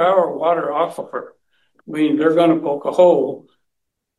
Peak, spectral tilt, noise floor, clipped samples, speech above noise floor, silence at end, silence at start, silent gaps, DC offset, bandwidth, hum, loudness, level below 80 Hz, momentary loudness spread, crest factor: -2 dBFS; -7 dB/octave; -77 dBFS; under 0.1%; 61 dB; 0.8 s; 0 s; none; under 0.1%; 12 kHz; none; -17 LUFS; -70 dBFS; 16 LU; 16 dB